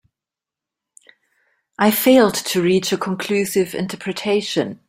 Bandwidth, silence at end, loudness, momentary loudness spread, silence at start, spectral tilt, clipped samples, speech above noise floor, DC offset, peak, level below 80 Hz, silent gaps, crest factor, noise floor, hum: 16 kHz; 0.15 s; -18 LUFS; 10 LU; 1.8 s; -4.5 dB/octave; under 0.1%; 70 dB; under 0.1%; -2 dBFS; -60 dBFS; none; 18 dB; -88 dBFS; none